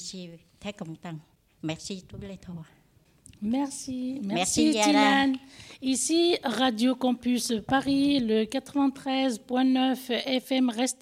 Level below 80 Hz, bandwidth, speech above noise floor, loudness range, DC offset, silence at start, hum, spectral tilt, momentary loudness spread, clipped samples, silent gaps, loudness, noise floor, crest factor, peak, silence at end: -60 dBFS; 15.5 kHz; 32 dB; 12 LU; under 0.1%; 0 s; none; -3.5 dB/octave; 19 LU; under 0.1%; none; -26 LUFS; -58 dBFS; 18 dB; -8 dBFS; 0.1 s